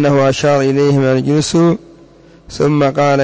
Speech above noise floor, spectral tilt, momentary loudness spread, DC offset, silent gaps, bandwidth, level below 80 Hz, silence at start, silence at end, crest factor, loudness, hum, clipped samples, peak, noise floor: 30 dB; -6.5 dB/octave; 5 LU; under 0.1%; none; 8 kHz; -46 dBFS; 0 s; 0 s; 8 dB; -13 LUFS; none; under 0.1%; -4 dBFS; -42 dBFS